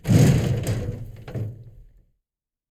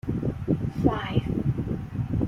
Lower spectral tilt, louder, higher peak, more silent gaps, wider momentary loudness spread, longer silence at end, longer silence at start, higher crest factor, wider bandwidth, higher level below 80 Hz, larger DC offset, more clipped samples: second, -7 dB/octave vs -9 dB/octave; first, -22 LUFS vs -28 LUFS; about the same, -6 dBFS vs -6 dBFS; neither; first, 19 LU vs 6 LU; first, 1 s vs 0 s; about the same, 0.05 s vs 0.05 s; about the same, 18 dB vs 20 dB; first, 14.5 kHz vs 7.2 kHz; about the same, -38 dBFS vs -40 dBFS; neither; neither